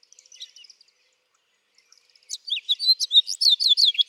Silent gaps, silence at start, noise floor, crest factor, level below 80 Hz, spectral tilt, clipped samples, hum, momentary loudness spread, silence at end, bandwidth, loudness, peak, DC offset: none; 0.4 s; -69 dBFS; 18 dB; under -90 dBFS; 9 dB/octave; under 0.1%; none; 22 LU; 0.05 s; 16 kHz; -18 LUFS; -6 dBFS; under 0.1%